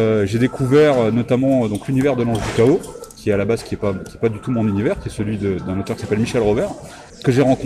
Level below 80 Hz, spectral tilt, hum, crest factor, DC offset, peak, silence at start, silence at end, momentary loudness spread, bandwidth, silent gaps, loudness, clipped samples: -42 dBFS; -7 dB/octave; none; 14 dB; under 0.1%; -4 dBFS; 0 s; 0 s; 9 LU; 14.5 kHz; none; -18 LUFS; under 0.1%